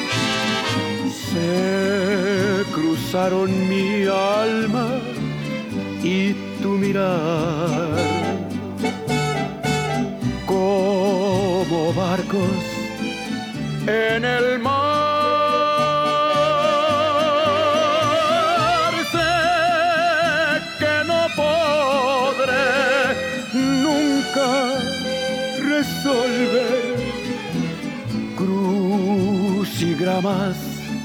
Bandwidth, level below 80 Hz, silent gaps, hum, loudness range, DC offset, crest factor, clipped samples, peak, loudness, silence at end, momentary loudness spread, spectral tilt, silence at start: 19 kHz; -50 dBFS; none; none; 4 LU; under 0.1%; 12 dB; under 0.1%; -6 dBFS; -20 LUFS; 0 s; 8 LU; -5 dB/octave; 0 s